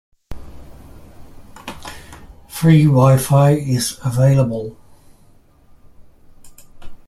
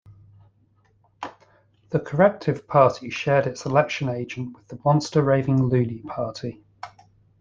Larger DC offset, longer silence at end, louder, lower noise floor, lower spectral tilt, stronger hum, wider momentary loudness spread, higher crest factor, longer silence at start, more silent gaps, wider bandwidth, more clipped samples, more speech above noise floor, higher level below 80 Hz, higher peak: neither; second, 0.15 s vs 0.55 s; first, -15 LUFS vs -22 LUFS; second, -49 dBFS vs -62 dBFS; about the same, -7 dB/octave vs -7 dB/octave; neither; first, 24 LU vs 19 LU; second, 16 dB vs 22 dB; first, 0.3 s vs 0.1 s; neither; first, 15 kHz vs 7.6 kHz; neither; second, 36 dB vs 40 dB; first, -42 dBFS vs -56 dBFS; about the same, -2 dBFS vs -2 dBFS